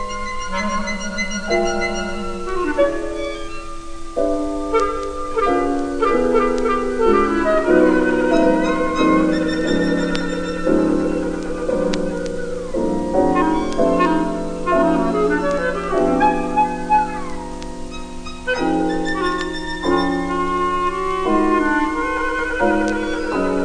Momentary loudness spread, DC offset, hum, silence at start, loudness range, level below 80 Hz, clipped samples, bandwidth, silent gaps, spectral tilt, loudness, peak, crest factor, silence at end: 10 LU; under 0.1%; none; 0 s; 6 LU; -32 dBFS; under 0.1%; 10 kHz; none; -5.5 dB/octave; -19 LUFS; -2 dBFS; 18 dB; 0 s